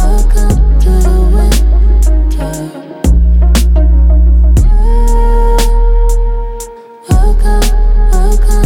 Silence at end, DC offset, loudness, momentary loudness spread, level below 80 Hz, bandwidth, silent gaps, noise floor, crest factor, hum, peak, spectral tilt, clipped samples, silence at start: 0 s; under 0.1%; -11 LUFS; 9 LU; -6 dBFS; 15 kHz; none; -27 dBFS; 6 dB; none; 0 dBFS; -6 dB/octave; under 0.1%; 0 s